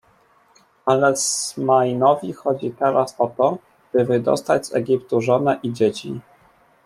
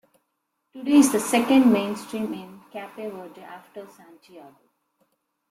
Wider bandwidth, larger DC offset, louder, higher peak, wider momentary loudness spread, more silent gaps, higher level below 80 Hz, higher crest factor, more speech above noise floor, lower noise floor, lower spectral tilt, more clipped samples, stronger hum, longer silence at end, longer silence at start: second, 14 kHz vs 15.5 kHz; neither; about the same, -20 LUFS vs -21 LUFS; first, -2 dBFS vs -6 dBFS; second, 7 LU vs 24 LU; neither; about the same, -64 dBFS vs -68 dBFS; about the same, 18 dB vs 20 dB; second, 38 dB vs 54 dB; second, -57 dBFS vs -77 dBFS; about the same, -4.5 dB/octave vs -4 dB/octave; neither; neither; second, 0.65 s vs 1.1 s; about the same, 0.85 s vs 0.75 s